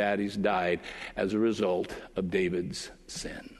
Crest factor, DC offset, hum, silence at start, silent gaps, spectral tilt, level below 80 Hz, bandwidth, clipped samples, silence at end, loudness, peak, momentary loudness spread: 18 dB; under 0.1%; none; 0 s; none; -5 dB/octave; -56 dBFS; 12 kHz; under 0.1%; 0 s; -31 LUFS; -12 dBFS; 11 LU